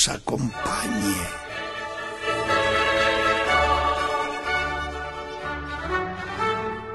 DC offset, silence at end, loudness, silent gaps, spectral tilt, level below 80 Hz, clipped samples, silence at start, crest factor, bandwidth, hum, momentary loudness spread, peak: under 0.1%; 0 s; -24 LUFS; none; -3 dB/octave; -40 dBFS; under 0.1%; 0 s; 20 dB; 13 kHz; none; 11 LU; -4 dBFS